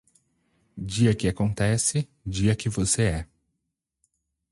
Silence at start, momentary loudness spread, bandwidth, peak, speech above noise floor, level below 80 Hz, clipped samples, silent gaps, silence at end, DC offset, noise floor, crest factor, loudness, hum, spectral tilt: 0.75 s; 10 LU; 11.5 kHz; -8 dBFS; 57 dB; -44 dBFS; under 0.1%; none; 1.25 s; under 0.1%; -81 dBFS; 18 dB; -25 LUFS; none; -5 dB/octave